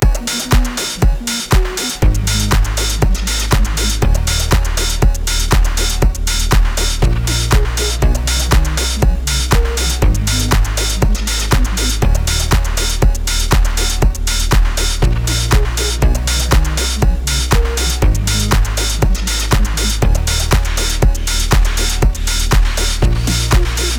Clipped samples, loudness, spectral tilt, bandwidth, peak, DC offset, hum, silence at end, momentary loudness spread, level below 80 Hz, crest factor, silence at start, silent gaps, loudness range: under 0.1%; -15 LUFS; -3.5 dB/octave; over 20 kHz; -2 dBFS; 0.4%; none; 0 s; 2 LU; -14 dBFS; 12 dB; 0 s; none; 0 LU